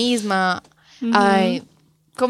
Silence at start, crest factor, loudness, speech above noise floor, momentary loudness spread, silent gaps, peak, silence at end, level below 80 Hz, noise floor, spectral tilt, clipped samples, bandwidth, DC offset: 0 s; 20 dB; -19 LUFS; 23 dB; 13 LU; none; 0 dBFS; 0 s; -62 dBFS; -42 dBFS; -4.5 dB/octave; under 0.1%; 13.5 kHz; under 0.1%